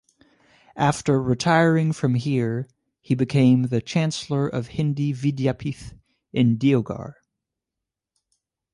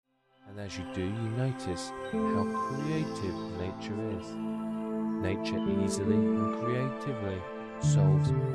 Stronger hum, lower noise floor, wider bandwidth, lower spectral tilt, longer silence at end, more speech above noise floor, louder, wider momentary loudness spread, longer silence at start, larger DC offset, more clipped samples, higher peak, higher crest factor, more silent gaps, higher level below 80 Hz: neither; first, -86 dBFS vs -55 dBFS; about the same, 11.5 kHz vs 11.5 kHz; about the same, -6.5 dB/octave vs -7 dB/octave; first, 1.6 s vs 0 s; first, 65 dB vs 25 dB; first, -22 LUFS vs -32 LUFS; first, 13 LU vs 10 LU; first, 0.75 s vs 0.45 s; neither; neither; first, -4 dBFS vs -14 dBFS; about the same, 18 dB vs 16 dB; neither; about the same, -54 dBFS vs -58 dBFS